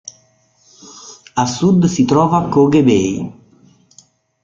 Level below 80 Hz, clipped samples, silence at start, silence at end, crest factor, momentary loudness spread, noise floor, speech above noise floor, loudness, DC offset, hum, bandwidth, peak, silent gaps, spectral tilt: -50 dBFS; under 0.1%; 0.85 s; 1.1 s; 14 dB; 24 LU; -55 dBFS; 43 dB; -14 LUFS; under 0.1%; none; 7.6 kHz; -2 dBFS; none; -6.5 dB/octave